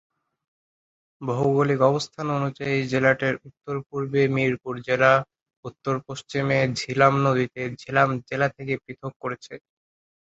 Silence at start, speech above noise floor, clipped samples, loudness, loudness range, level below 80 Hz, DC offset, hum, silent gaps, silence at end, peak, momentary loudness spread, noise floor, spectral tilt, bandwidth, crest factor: 1.2 s; over 67 dB; under 0.1%; -24 LUFS; 2 LU; -60 dBFS; under 0.1%; none; 3.86-3.90 s, 5.42-5.46 s, 5.57-5.63 s, 9.16-9.20 s; 0.75 s; -2 dBFS; 14 LU; under -90 dBFS; -6.5 dB/octave; 8 kHz; 22 dB